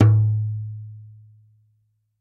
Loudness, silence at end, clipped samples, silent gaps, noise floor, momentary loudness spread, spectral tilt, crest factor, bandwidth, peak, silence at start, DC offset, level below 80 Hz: -22 LUFS; 1.15 s; under 0.1%; none; -67 dBFS; 23 LU; -10.5 dB/octave; 20 dB; 2.9 kHz; -2 dBFS; 0 s; under 0.1%; -52 dBFS